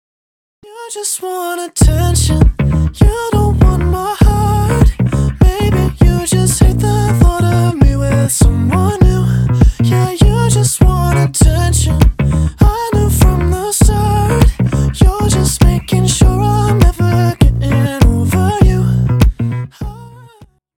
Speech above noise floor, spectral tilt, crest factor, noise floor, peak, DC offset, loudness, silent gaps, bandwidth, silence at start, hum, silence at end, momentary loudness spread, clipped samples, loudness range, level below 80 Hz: 32 dB; -6 dB/octave; 10 dB; -43 dBFS; 0 dBFS; under 0.1%; -12 LUFS; none; 17 kHz; 0.7 s; none; 0.7 s; 4 LU; under 0.1%; 1 LU; -16 dBFS